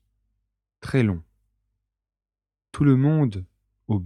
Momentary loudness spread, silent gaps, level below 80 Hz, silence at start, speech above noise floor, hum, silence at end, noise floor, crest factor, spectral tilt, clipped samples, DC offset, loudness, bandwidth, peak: 19 LU; none; -52 dBFS; 0.85 s; over 70 dB; none; 0 s; under -90 dBFS; 18 dB; -9 dB/octave; under 0.1%; under 0.1%; -22 LUFS; 10.5 kHz; -8 dBFS